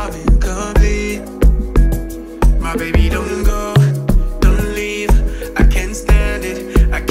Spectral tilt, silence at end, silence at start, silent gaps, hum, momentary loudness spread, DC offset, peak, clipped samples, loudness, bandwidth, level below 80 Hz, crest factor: -6 dB/octave; 0 s; 0 s; none; none; 5 LU; under 0.1%; -2 dBFS; under 0.1%; -16 LUFS; 15.5 kHz; -14 dBFS; 12 dB